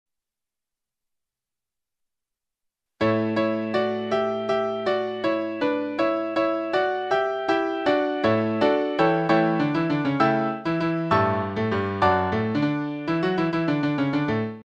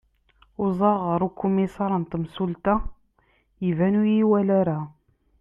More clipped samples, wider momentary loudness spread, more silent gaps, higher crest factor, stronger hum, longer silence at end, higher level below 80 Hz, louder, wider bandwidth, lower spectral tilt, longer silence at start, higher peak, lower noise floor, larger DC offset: neither; second, 4 LU vs 10 LU; neither; about the same, 18 dB vs 16 dB; neither; second, 0.1 s vs 0.5 s; second, -58 dBFS vs -44 dBFS; about the same, -23 LUFS vs -23 LUFS; first, 8 kHz vs 3.8 kHz; second, -7.5 dB/octave vs -10 dB/octave; first, 3 s vs 0.6 s; about the same, -6 dBFS vs -8 dBFS; first, -89 dBFS vs -65 dBFS; neither